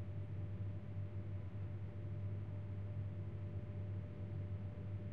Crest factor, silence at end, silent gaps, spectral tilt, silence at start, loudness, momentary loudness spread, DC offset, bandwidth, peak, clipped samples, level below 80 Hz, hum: 10 dB; 0 s; none; -9.5 dB/octave; 0 s; -47 LUFS; 2 LU; 0.2%; 3.9 kHz; -34 dBFS; under 0.1%; -62 dBFS; none